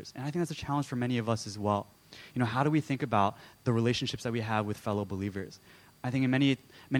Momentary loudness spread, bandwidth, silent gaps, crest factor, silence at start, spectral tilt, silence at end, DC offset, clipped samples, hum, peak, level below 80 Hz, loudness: 9 LU; 18 kHz; none; 20 dB; 0 s; -6 dB/octave; 0 s; under 0.1%; under 0.1%; none; -12 dBFS; -64 dBFS; -31 LUFS